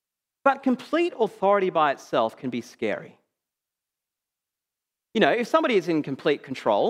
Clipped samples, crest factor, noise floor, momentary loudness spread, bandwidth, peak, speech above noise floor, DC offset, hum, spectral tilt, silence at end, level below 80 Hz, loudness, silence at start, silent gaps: under 0.1%; 22 dB; -88 dBFS; 9 LU; 15 kHz; -4 dBFS; 64 dB; under 0.1%; none; -5.5 dB/octave; 0 s; -78 dBFS; -24 LUFS; 0.45 s; none